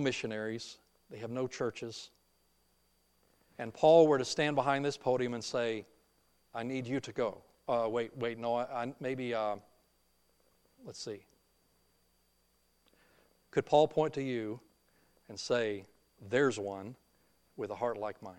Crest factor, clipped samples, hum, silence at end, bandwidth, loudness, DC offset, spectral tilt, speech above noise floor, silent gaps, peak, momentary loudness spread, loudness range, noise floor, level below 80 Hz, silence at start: 22 dB; under 0.1%; none; 0 s; 12 kHz; -33 LUFS; under 0.1%; -5 dB/octave; 40 dB; none; -12 dBFS; 18 LU; 13 LU; -73 dBFS; -74 dBFS; 0 s